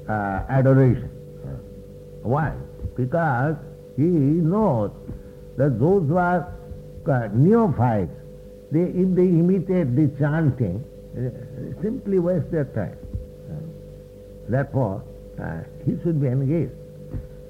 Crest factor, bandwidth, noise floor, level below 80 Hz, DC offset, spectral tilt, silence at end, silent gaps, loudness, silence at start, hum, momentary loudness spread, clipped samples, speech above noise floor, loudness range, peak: 16 dB; 5 kHz; -41 dBFS; -44 dBFS; under 0.1%; -10.5 dB/octave; 0 s; none; -22 LUFS; 0 s; none; 20 LU; under 0.1%; 20 dB; 7 LU; -6 dBFS